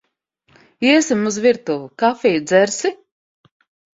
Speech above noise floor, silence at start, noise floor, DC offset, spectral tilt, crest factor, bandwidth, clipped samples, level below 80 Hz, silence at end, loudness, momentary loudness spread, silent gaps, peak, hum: 47 dB; 0.8 s; -63 dBFS; under 0.1%; -3.5 dB/octave; 18 dB; 8 kHz; under 0.1%; -62 dBFS; 1 s; -17 LUFS; 8 LU; none; -2 dBFS; none